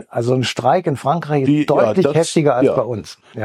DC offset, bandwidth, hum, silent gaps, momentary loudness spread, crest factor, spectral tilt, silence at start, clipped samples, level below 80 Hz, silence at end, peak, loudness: under 0.1%; 13 kHz; none; none; 6 LU; 14 dB; -6 dB/octave; 0.15 s; under 0.1%; -56 dBFS; 0 s; -2 dBFS; -16 LUFS